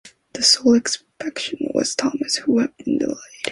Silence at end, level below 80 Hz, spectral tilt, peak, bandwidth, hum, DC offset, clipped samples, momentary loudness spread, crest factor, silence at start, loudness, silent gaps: 0 s; -60 dBFS; -2 dB/octave; -2 dBFS; 11.5 kHz; none; under 0.1%; under 0.1%; 12 LU; 18 dB; 0.05 s; -20 LUFS; none